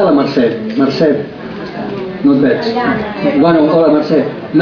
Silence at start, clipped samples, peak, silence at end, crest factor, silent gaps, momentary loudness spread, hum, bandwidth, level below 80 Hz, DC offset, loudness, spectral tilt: 0 s; under 0.1%; 0 dBFS; 0 s; 12 dB; none; 12 LU; none; 5.4 kHz; -46 dBFS; under 0.1%; -12 LUFS; -8 dB/octave